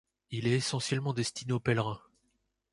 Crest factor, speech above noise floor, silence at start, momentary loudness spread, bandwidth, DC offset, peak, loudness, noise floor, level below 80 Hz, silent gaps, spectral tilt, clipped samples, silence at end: 20 dB; 46 dB; 0.3 s; 8 LU; 11.5 kHz; under 0.1%; -14 dBFS; -32 LUFS; -77 dBFS; -64 dBFS; none; -5 dB/octave; under 0.1%; 0.75 s